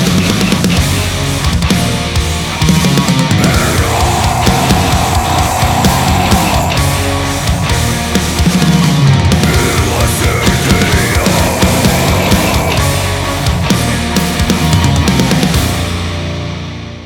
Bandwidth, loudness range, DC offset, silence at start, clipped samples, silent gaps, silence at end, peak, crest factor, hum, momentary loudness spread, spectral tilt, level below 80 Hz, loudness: 20 kHz; 1 LU; under 0.1%; 0 s; under 0.1%; none; 0 s; 0 dBFS; 10 dB; none; 4 LU; -4.5 dB/octave; -20 dBFS; -11 LUFS